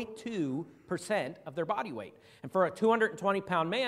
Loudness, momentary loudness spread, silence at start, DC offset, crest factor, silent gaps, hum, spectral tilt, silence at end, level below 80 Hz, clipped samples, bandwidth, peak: -32 LUFS; 13 LU; 0 s; under 0.1%; 18 dB; none; none; -5.5 dB/octave; 0 s; -74 dBFS; under 0.1%; 14 kHz; -14 dBFS